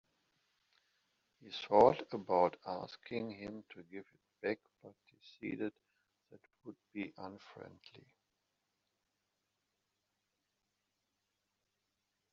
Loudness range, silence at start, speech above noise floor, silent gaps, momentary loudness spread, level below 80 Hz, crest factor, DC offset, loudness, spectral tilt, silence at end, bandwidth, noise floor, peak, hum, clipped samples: 18 LU; 1.45 s; 49 dB; none; 25 LU; -78 dBFS; 28 dB; under 0.1%; -36 LUFS; -4 dB/octave; 4.35 s; 7.2 kHz; -86 dBFS; -12 dBFS; none; under 0.1%